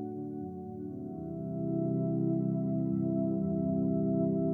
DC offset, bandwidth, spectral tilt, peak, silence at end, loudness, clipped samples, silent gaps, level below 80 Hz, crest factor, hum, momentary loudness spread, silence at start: under 0.1%; 2 kHz; -14.5 dB/octave; -18 dBFS; 0 s; -33 LUFS; under 0.1%; none; -62 dBFS; 12 dB; none; 11 LU; 0 s